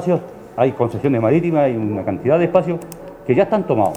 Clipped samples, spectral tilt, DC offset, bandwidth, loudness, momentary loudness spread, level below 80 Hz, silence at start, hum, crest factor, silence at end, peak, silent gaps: under 0.1%; -8.5 dB/octave; under 0.1%; 18.5 kHz; -18 LUFS; 10 LU; -52 dBFS; 0 s; none; 18 dB; 0 s; 0 dBFS; none